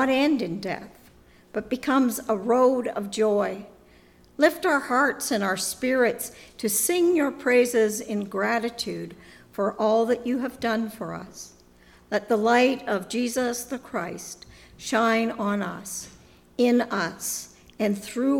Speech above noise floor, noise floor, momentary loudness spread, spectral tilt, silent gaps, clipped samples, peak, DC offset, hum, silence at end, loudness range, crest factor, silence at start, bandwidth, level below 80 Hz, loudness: 30 dB; -54 dBFS; 15 LU; -3.5 dB/octave; none; under 0.1%; -4 dBFS; under 0.1%; none; 0 s; 4 LU; 20 dB; 0 s; 18 kHz; -60 dBFS; -25 LUFS